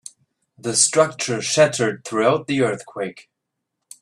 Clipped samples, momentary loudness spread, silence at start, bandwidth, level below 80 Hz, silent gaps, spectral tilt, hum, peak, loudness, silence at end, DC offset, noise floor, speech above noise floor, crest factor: under 0.1%; 14 LU; 0.65 s; 14 kHz; -64 dBFS; none; -3 dB/octave; none; -2 dBFS; -19 LUFS; 0.8 s; under 0.1%; -80 dBFS; 60 dB; 20 dB